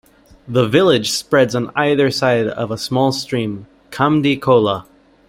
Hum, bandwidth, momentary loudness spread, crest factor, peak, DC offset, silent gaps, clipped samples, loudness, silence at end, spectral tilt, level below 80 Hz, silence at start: none; 16.5 kHz; 9 LU; 16 dB; -2 dBFS; under 0.1%; none; under 0.1%; -16 LUFS; 0.5 s; -5 dB/octave; -52 dBFS; 0.45 s